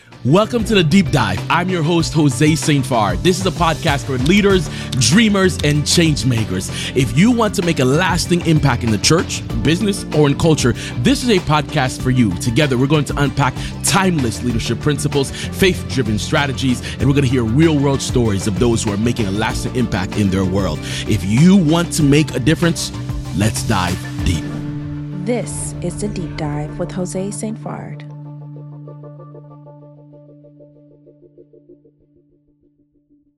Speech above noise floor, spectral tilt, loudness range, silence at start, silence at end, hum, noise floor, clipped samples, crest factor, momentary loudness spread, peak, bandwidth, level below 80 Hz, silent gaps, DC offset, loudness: 42 dB; -5 dB/octave; 9 LU; 0.1 s; 1.65 s; none; -58 dBFS; under 0.1%; 16 dB; 10 LU; 0 dBFS; 14.5 kHz; -34 dBFS; none; under 0.1%; -16 LUFS